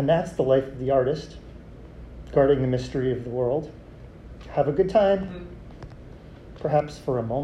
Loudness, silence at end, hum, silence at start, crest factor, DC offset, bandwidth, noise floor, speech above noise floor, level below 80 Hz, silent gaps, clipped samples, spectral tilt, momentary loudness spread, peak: -24 LUFS; 0 s; none; 0 s; 18 dB; under 0.1%; 10.5 kHz; -43 dBFS; 20 dB; -44 dBFS; none; under 0.1%; -8 dB/octave; 24 LU; -6 dBFS